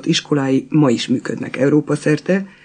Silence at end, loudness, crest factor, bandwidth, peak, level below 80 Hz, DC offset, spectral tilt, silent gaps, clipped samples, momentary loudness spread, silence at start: 0.15 s; -17 LUFS; 14 dB; 9.6 kHz; -4 dBFS; -64 dBFS; under 0.1%; -6 dB/octave; none; under 0.1%; 5 LU; 0 s